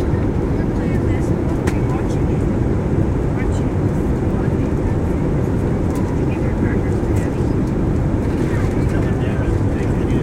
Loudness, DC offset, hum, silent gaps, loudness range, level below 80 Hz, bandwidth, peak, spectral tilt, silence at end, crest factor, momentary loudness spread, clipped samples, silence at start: -19 LUFS; under 0.1%; none; none; 0 LU; -24 dBFS; 12.5 kHz; -2 dBFS; -8.5 dB/octave; 0 s; 16 dB; 1 LU; under 0.1%; 0 s